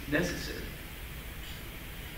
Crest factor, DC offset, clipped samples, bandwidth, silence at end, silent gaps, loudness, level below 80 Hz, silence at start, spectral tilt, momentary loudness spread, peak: 22 dB; under 0.1%; under 0.1%; 16.5 kHz; 0 s; none; -38 LUFS; -44 dBFS; 0 s; -4.5 dB/octave; 12 LU; -14 dBFS